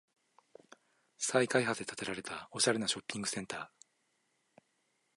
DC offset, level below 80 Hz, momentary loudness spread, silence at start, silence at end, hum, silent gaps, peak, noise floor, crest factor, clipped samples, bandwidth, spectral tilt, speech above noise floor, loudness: under 0.1%; -76 dBFS; 13 LU; 1.2 s; 1.5 s; none; none; -12 dBFS; -78 dBFS; 26 dB; under 0.1%; 11.5 kHz; -2.5 dB/octave; 43 dB; -34 LUFS